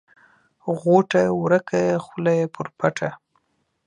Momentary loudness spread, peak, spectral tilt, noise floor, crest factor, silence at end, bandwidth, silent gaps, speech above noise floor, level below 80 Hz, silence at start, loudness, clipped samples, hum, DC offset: 11 LU; -2 dBFS; -7 dB/octave; -70 dBFS; 20 dB; 0.7 s; 10 kHz; none; 49 dB; -64 dBFS; 0.65 s; -21 LUFS; under 0.1%; none; under 0.1%